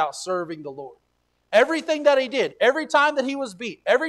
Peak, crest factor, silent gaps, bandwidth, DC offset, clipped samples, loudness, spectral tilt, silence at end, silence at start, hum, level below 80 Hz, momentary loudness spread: -4 dBFS; 18 dB; none; 12.5 kHz; under 0.1%; under 0.1%; -22 LUFS; -3 dB/octave; 0 s; 0 s; none; -72 dBFS; 15 LU